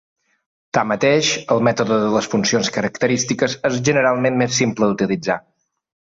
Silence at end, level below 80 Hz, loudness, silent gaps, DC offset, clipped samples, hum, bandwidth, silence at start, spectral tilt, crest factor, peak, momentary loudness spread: 0.65 s; -56 dBFS; -18 LUFS; none; under 0.1%; under 0.1%; none; 8 kHz; 0.75 s; -4 dB/octave; 16 dB; -4 dBFS; 5 LU